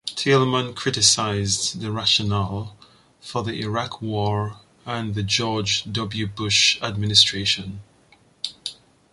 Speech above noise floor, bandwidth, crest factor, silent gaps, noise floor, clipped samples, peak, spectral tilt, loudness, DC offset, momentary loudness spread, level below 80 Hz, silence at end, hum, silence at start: 34 dB; 11.5 kHz; 22 dB; none; -56 dBFS; under 0.1%; 0 dBFS; -3 dB/octave; -21 LUFS; under 0.1%; 16 LU; -48 dBFS; 0.4 s; none; 0.05 s